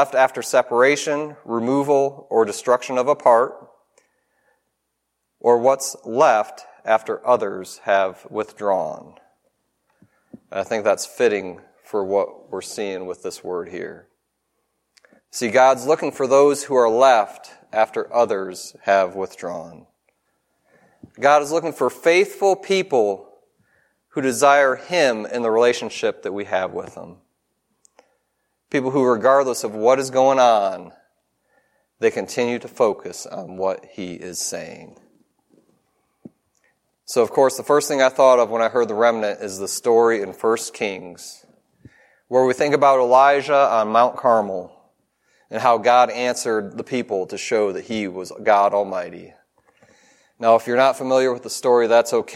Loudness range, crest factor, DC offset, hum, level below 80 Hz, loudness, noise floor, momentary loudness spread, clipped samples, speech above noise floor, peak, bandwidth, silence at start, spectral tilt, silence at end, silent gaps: 8 LU; 18 dB; under 0.1%; none; -72 dBFS; -19 LUFS; -76 dBFS; 15 LU; under 0.1%; 57 dB; -2 dBFS; 16 kHz; 0 s; -3.5 dB/octave; 0 s; none